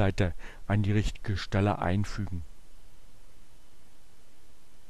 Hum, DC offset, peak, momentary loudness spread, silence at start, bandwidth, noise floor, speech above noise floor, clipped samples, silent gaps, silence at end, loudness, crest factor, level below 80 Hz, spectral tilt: none; 1%; -14 dBFS; 13 LU; 0 s; 12 kHz; -57 dBFS; 29 dB; under 0.1%; none; 0.35 s; -30 LUFS; 18 dB; -42 dBFS; -7 dB/octave